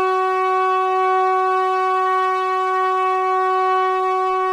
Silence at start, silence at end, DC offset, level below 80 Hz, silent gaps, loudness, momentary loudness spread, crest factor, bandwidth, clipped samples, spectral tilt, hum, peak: 0 s; 0 s; under 0.1%; -64 dBFS; none; -18 LUFS; 2 LU; 10 dB; 11.5 kHz; under 0.1%; -3 dB/octave; none; -8 dBFS